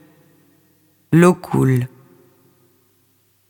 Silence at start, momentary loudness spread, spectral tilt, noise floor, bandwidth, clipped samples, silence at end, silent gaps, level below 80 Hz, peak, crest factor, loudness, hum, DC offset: 1.1 s; 8 LU; -7.5 dB/octave; -60 dBFS; 18 kHz; under 0.1%; 1.65 s; none; -54 dBFS; 0 dBFS; 20 dB; -16 LUFS; none; under 0.1%